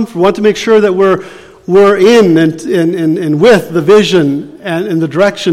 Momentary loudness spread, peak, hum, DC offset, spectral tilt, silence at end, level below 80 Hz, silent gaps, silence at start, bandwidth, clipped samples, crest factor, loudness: 9 LU; 0 dBFS; none; under 0.1%; -6 dB/octave; 0 s; -46 dBFS; none; 0 s; 15 kHz; under 0.1%; 8 dB; -9 LUFS